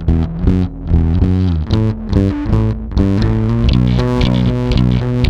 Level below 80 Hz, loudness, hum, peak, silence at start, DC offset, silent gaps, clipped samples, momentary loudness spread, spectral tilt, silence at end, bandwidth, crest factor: -20 dBFS; -15 LUFS; none; 0 dBFS; 0 s; under 0.1%; none; under 0.1%; 3 LU; -8.5 dB/octave; 0 s; 7.6 kHz; 12 dB